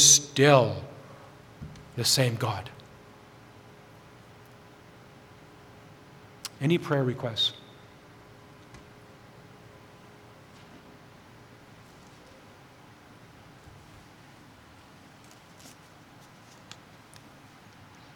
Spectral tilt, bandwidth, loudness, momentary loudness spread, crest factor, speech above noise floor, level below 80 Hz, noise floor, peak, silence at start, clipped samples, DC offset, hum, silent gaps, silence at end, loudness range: -3 dB/octave; 19 kHz; -24 LUFS; 28 LU; 28 dB; 28 dB; -64 dBFS; -52 dBFS; -4 dBFS; 0 s; under 0.1%; under 0.1%; none; none; 10.65 s; 20 LU